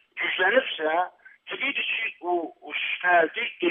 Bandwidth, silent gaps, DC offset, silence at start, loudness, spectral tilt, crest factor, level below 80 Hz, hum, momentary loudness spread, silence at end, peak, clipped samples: 3.8 kHz; none; under 0.1%; 0.15 s; -25 LUFS; -6 dB/octave; 18 dB; -88 dBFS; none; 9 LU; 0 s; -8 dBFS; under 0.1%